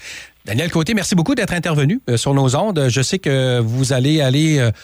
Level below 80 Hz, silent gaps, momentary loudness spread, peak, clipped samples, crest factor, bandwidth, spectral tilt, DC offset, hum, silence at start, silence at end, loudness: -46 dBFS; none; 4 LU; -6 dBFS; under 0.1%; 10 dB; over 20 kHz; -5.5 dB/octave; under 0.1%; none; 0 s; 0 s; -17 LUFS